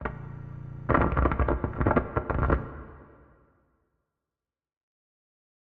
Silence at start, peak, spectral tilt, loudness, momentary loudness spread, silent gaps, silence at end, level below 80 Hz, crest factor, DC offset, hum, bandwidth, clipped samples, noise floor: 0 s; -8 dBFS; -8 dB/octave; -27 LUFS; 16 LU; none; 2.65 s; -36 dBFS; 22 dB; under 0.1%; none; 4.1 kHz; under 0.1%; under -90 dBFS